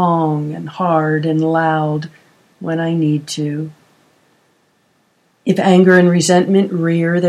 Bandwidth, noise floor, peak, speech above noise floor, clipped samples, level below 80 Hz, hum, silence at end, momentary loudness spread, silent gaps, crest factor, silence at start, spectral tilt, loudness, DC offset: 12 kHz; -59 dBFS; 0 dBFS; 45 dB; under 0.1%; -64 dBFS; none; 0 s; 14 LU; none; 16 dB; 0 s; -6 dB/octave; -15 LUFS; under 0.1%